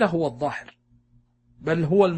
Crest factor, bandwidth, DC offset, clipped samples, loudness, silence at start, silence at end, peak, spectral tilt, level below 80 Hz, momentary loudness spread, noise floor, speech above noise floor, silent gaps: 20 dB; 8.6 kHz; under 0.1%; under 0.1%; -25 LUFS; 0 s; 0 s; -6 dBFS; -7.5 dB/octave; -58 dBFS; 13 LU; -61 dBFS; 39 dB; none